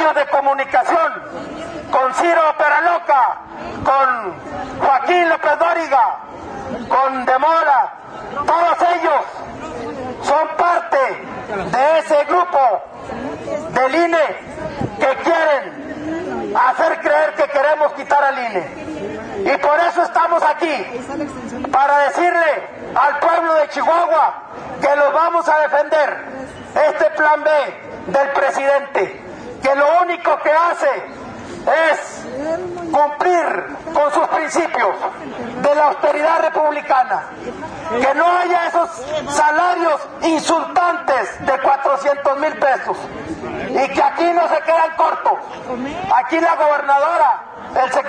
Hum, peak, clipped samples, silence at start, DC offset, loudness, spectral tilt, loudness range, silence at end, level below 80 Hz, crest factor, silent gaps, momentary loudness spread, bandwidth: none; 0 dBFS; under 0.1%; 0 s; under 0.1%; -16 LUFS; -4 dB/octave; 2 LU; 0 s; -52 dBFS; 16 dB; none; 13 LU; 10.5 kHz